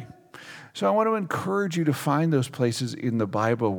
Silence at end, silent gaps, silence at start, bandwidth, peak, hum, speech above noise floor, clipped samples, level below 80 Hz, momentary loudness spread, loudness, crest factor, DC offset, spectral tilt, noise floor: 0 s; none; 0 s; over 20 kHz; -10 dBFS; none; 21 dB; under 0.1%; -72 dBFS; 19 LU; -25 LUFS; 16 dB; under 0.1%; -6.5 dB/octave; -45 dBFS